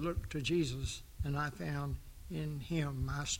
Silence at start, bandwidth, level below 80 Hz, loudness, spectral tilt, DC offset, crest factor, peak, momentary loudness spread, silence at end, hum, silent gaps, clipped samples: 0 s; 16.5 kHz; -46 dBFS; -38 LUFS; -5 dB/octave; under 0.1%; 14 dB; -22 dBFS; 8 LU; 0 s; none; none; under 0.1%